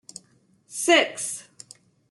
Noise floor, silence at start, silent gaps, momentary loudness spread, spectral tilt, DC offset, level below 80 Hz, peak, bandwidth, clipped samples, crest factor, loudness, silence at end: -62 dBFS; 0.7 s; none; 26 LU; -0.5 dB/octave; under 0.1%; -82 dBFS; -6 dBFS; 12.5 kHz; under 0.1%; 22 dB; -22 LUFS; 0.7 s